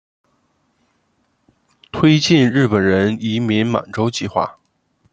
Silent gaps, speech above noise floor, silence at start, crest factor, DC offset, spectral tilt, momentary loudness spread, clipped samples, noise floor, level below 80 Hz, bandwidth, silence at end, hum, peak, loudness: none; 49 dB; 1.95 s; 18 dB; under 0.1%; -6 dB/octave; 9 LU; under 0.1%; -64 dBFS; -54 dBFS; 8.8 kHz; 0.6 s; none; 0 dBFS; -16 LUFS